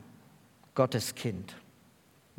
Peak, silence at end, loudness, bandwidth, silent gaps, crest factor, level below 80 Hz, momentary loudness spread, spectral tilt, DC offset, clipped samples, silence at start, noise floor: -10 dBFS; 0.8 s; -33 LUFS; 18 kHz; none; 26 dB; -74 dBFS; 18 LU; -5 dB/octave; under 0.1%; under 0.1%; 0 s; -63 dBFS